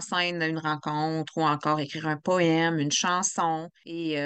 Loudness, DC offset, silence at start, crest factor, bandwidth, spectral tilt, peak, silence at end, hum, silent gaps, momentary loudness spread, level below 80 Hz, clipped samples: -26 LUFS; under 0.1%; 0 s; 16 dB; 9.2 kHz; -4 dB/octave; -10 dBFS; 0 s; none; none; 7 LU; -76 dBFS; under 0.1%